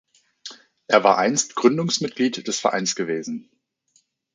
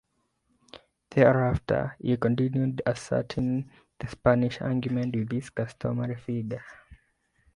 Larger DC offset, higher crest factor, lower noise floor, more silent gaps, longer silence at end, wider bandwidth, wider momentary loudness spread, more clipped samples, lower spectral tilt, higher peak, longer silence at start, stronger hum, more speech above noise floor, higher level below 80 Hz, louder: neither; about the same, 22 dB vs 22 dB; second, -65 dBFS vs -73 dBFS; neither; first, 0.95 s vs 0.6 s; second, 9.6 kHz vs 11 kHz; first, 22 LU vs 11 LU; neither; second, -3.5 dB/octave vs -8 dB/octave; first, -2 dBFS vs -6 dBFS; second, 0.45 s vs 0.75 s; neither; about the same, 44 dB vs 47 dB; second, -72 dBFS vs -50 dBFS; first, -21 LUFS vs -27 LUFS